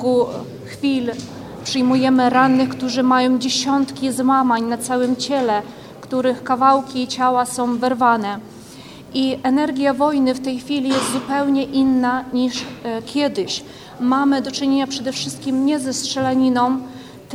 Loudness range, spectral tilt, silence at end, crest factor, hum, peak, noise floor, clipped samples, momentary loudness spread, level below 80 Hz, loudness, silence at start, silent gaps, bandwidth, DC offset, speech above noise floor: 3 LU; -4 dB/octave; 0 s; 18 dB; none; -2 dBFS; -38 dBFS; under 0.1%; 11 LU; -56 dBFS; -19 LUFS; 0 s; none; 14 kHz; under 0.1%; 20 dB